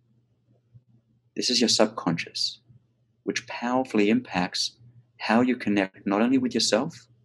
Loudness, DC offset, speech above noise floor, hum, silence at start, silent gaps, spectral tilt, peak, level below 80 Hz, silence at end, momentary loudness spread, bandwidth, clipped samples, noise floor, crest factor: -25 LUFS; under 0.1%; 41 dB; none; 1.35 s; none; -3.5 dB/octave; -4 dBFS; -70 dBFS; 0.25 s; 9 LU; 12.5 kHz; under 0.1%; -66 dBFS; 22 dB